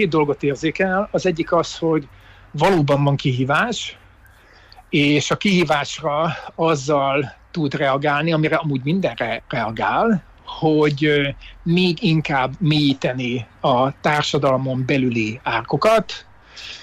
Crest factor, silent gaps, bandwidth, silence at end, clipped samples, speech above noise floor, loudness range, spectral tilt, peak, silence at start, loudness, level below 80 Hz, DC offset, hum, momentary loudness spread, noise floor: 14 dB; none; 12.5 kHz; 0 s; under 0.1%; 30 dB; 1 LU; -6 dB/octave; -6 dBFS; 0 s; -19 LUFS; -48 dBFS; under 0.1%; none; 7 LU; -48 dBFS